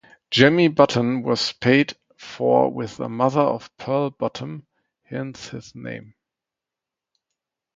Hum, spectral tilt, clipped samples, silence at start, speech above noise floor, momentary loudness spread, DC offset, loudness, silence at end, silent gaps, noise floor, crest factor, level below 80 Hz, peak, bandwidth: none; -5.5 dB/octave; under 0.1%; 0.3 s; 66 dB; 19 LU; under 0.1%; -20 LUFS; 1.75 s; none; -87 dBFS; 22 dB; -62 dBFS; 0 dBFS; 7.8 kHz